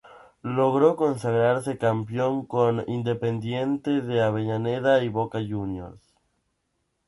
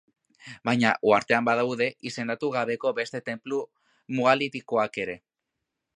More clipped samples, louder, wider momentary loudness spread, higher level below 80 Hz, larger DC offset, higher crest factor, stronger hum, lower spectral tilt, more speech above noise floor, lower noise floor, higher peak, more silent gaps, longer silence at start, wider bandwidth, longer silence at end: neither; about the same, -25 LUFS vs -26 LUFS; about the same, 9 LU vs 11 LU; first, -58 dBFS vs -70 dBFS; neither; about the same, 20 dB vs 22 dB; neither; first, -7.5 dB/octave vs -5 dB/octave; second, 51 dB vs 58 dB; second, -75 dBFS vs -84 dBFS; about the same, -6 dBFS vs -6 dBFS; neither; second, 0.05 s vs 0.45 s; about the same, 11.5 kHz vs 10.5 kHz; first, 1.1 s vs 0.8 s